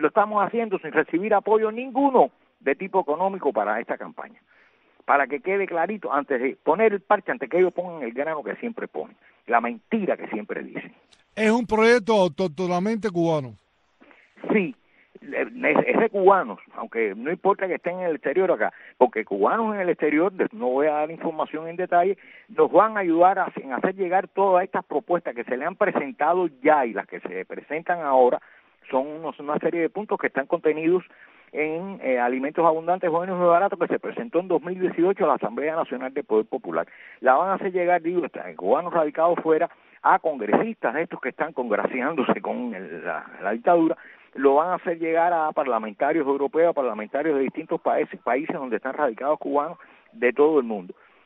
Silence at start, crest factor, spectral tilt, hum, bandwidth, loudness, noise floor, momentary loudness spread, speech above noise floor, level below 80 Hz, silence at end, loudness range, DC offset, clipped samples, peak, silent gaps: 0 s; 20 dB; -7 dB/octave; none; 9 kHz; -23 LUFS; -57 dBFS; 12 LU; 34 dB; -68 dBFS; 0.4 s; 3 LU; under 0.1%; under 0.1%; -2 dBFS; none